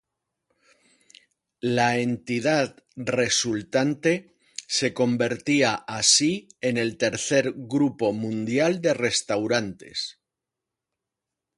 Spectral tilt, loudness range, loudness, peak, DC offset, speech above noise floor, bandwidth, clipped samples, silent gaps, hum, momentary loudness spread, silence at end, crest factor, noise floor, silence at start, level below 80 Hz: -3.5 dB/octave; 4 LU; -24 LUFS; -6 dBFS; under 0.1%; 62 dB; 11.5 kHz; under 0.1%; none; none; 9 LU; 1.45 s; 20 dB; -86 dBFS; 1.65 s; -64 dBFS